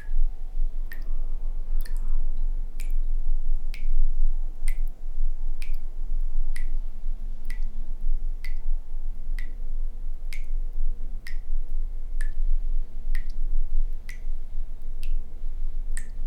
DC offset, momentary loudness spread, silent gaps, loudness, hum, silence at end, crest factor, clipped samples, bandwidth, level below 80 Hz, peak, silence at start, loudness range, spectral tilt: under 0.1%; 6 LU; none; -35 LUFS; none; 0 s; 12 dB; under 0.1%; 2.6 kHz; -22 dBFS; -8 dBFS; 0 s; 4 LU; -5.5 dB/octave